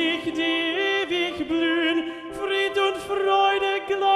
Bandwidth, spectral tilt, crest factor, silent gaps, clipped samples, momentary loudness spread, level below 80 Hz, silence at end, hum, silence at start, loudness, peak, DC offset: 12.5 kHz; -3.5 dB/octave; 14 dB; none; under 0.1%; 6 LU; -60 dBFS; 0 s; none; 0 s; -23 LUFS; -10 dBFS; under 0.1%